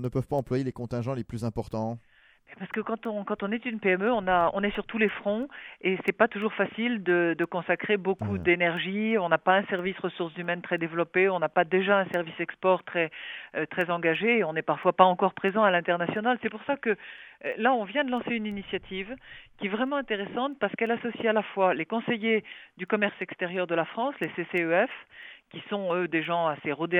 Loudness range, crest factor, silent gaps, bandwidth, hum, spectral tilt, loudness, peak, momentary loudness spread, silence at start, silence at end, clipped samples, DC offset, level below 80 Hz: 5 LU; 24 dB; none; 11.5 kHz; none; -7.5 dB/octave; -27 LUFS; -4 dBFS; 10 LU; 0 s; 0 s; under 0.1%; under 0.1%; -60 dBFS